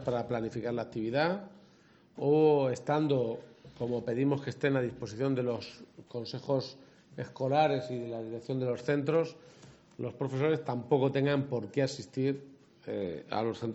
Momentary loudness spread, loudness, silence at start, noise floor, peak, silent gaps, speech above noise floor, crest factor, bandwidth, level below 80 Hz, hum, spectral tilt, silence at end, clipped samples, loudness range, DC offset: 13 LU; -32 LUFS; 0 s; -62 dBFS; -14 dBFS; none; 30 dB; 18 dB; 8.2 kHz; -70 dBFS; none; -7 dB/octave; 0 s; under 0.1%; 4 LU; under 0.1%